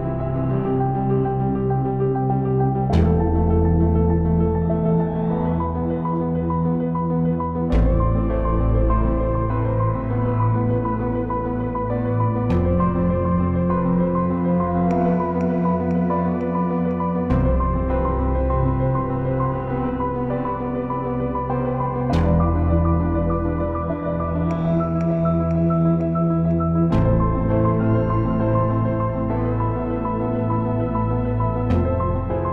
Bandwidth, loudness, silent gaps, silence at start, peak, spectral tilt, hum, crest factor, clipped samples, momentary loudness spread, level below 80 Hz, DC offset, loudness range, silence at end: 4.6 kHz; -21 LUFS; none; 0 s; -6 dBFS; -11 dB/octave; none; 14 dB; under 0.1%; 5 LU; -28 dBFS; under 0.1%; 3 LU; 0 s